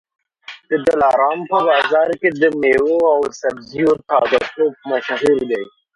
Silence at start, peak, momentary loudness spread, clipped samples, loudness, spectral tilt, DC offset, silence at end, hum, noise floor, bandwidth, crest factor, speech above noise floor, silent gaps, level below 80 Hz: 0.5 s; -2 dBFS; 9 LU; under 0.1%; -16 LUFS; -5 dB/octave; under 0.1%; 0.25 s; none; -40 dBFS; 11 kHz; 16 dB; 24 dB; none; -54 dBFS